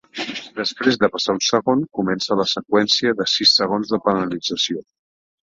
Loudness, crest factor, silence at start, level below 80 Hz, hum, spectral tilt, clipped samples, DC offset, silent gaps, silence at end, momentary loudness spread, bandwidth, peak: -19 LUFS; 18 dB; 0.15 s; -60 dBFS; none; -3.5 dB/octave; under 0.1%; under 0.1%; none; 0.6 s; 10 LU; 7.8 kHz; -2 dBFS